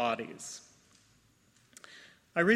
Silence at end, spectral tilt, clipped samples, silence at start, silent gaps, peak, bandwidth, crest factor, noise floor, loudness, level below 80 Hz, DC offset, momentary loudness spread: 0 s; -4.5 dB/octave; under 0.1%; 0 s; none; -12 dBFS; 14 kHz; 22 dB; -67 dBFS; -36 LUFS; -76 dBFS; under 0.1%; 24 LU